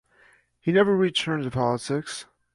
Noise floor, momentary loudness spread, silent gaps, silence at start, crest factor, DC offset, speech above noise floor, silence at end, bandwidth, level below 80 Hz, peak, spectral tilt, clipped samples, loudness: -59 dBFS; 12 LU; none; 0.65 s; 16 dB; under 0.1%; 36 dB; 0.3 s; 11.5 kHz; -60 dBFS; -8 dBFS; -5.5 dB/octave; under 0.1%; -24 LUFS